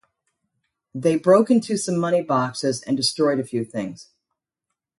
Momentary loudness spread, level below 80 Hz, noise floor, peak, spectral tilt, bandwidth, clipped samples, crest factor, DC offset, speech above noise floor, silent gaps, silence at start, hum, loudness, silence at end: 12 LU; -66 dBFS; -83 dBFS; -4 dBFS; -5 dB/octave; 11.5 kHz; under 0.1%; 18 dB; under 0.1%; 62 dB; none; 0.95 s; none; -21 LUFS; 0.95 s